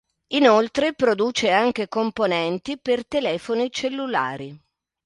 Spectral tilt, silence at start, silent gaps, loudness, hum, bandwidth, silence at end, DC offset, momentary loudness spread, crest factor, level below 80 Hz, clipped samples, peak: -4 dB/octave; 0.3 s; none; -22 LUFS; none; 11 kHz; 0.5 s; under 0.1%; 9 LU; 20 dB; -60 dBFS; under 0.1%; -2 dBFS